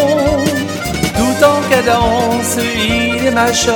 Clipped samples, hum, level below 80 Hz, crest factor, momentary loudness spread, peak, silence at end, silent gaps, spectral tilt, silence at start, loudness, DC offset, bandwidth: under 0.1%; none; -32 dBFS; 12 dB; 5 LU; 0 dBFS; 0 s; none; -4 dB/octave; 0 s; -13 LUFS; under 0.1%; 19 kHz